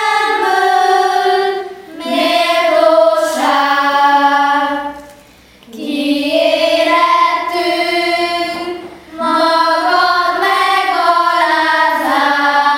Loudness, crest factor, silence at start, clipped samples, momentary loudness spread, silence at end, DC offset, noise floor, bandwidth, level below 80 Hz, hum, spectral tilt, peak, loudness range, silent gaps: -12 LUFS; 12 dB; 0 s; under 0.1%; 9 LU; 0 s; under 0.1%; -42 dBFS; 16.5 kHz; -56 dBFS; none; -2 dB/octave; 0 dBFS; 2 LU; none